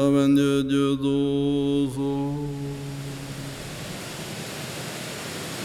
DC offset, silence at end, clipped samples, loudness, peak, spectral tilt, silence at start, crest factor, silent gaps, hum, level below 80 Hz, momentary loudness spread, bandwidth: under 0.1%; 0 s; under 0.1%; -26 LUFS; -10 dBFS; -6 dB/octave; 0 s; 16 dB; none; none; -50 dBFS; 14 LU; 15.5 kHz